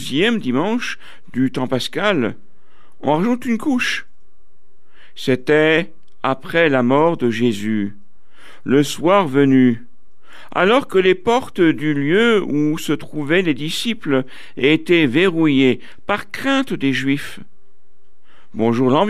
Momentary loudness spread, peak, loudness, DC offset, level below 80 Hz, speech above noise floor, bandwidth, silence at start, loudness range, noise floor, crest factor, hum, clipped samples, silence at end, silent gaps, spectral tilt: 11 LU; -2 dBFS; -17 LUFS; 4%; -56 dBFS; 46 dB; 14.5 kHz; 0 s; 4 LU; -63 dBFS; 16 dB; none; under 0.1%; 0 s; none; -5.5 dB/octave